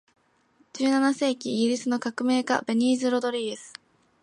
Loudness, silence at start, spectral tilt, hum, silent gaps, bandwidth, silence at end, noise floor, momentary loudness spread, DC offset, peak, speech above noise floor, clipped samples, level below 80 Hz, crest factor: -25 LUFS; 0.75 s; -4 dB/octave; none; none; 11 kHz; 0.55 s; -64 dBFS; 10 LU; under 0.1%; -8 dBFS; 39 dB; under 0.1%; -78 dBFS; 18 dB